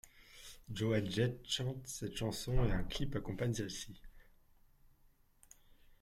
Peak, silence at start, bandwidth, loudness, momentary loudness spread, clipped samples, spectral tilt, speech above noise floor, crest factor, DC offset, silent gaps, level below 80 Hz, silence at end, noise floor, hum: -20 dBFS; 0.05 s; 15.5 kHz; -39 LUFS; 18 LU; under 0.1%; -5 dB/octave; 32 dB; 20 dB; under 0.1%; none; -48 dBFS; 1.8 s; -69 dBFS; none